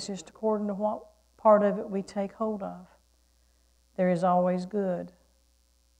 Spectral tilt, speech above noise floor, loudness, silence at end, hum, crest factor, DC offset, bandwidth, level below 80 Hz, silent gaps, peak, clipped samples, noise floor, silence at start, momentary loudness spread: -7 dB/octave; 39 dB; -28 LUFS; 0.9 s; none; 20 dB; under 0.1%; 10 kHz; -66 dBFS; none; -10 dBFS; under 0.1%; -66 dBFS; 0 s; 17 LU